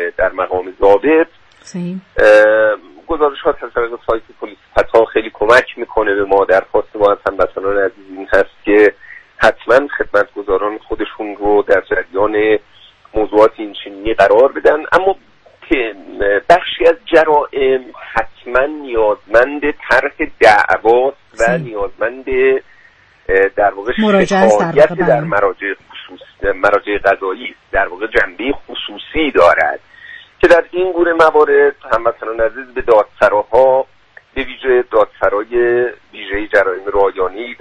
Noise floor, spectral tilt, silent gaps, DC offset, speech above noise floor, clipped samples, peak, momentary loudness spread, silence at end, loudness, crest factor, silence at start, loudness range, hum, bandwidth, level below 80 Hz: -47 dBFS; -5.5 dB/octave; none; under 0.1%; 36 dB; under 0.1%; 0 dBFS; 12 LU; 0.05 s; -14 LUFS; 14 dB; 0 s; 3 LU; none; 10.5 kHz; -38 dBFS